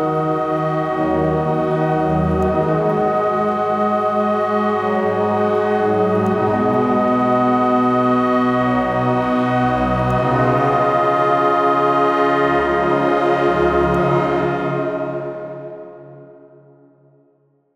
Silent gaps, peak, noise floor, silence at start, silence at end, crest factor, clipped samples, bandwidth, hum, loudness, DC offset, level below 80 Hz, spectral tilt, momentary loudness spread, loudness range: none; -4 dBFS; -59 dBFS; 0 s; 1.45 s; 14 dB; under 0.1%; 11.5 kHz; none; -17 LUFS; under 0.1%; -42 dBFS; -8 dB/octave; 4 LU; 4 LU